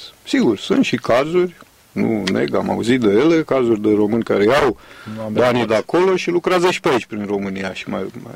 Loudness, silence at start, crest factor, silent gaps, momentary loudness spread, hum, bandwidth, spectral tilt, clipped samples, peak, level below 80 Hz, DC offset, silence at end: -17 LUFS; 0 s; 16 dB; none; 10 LU; none; 15.5 kHz; -6 dB/octave; under 0.1%; -2 dBFS; -50 dBFS; under 0.1%; 0 s